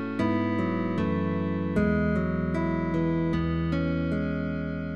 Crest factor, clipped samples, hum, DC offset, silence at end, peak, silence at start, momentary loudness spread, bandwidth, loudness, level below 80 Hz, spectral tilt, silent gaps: 14 dB; under 0.1%; none; 0.5%; 0 s; -14 dBFS; 0 s; 3 LU; 6.6 kHz; -27 LUFS; -44 dBFS; -9 dB/octave; none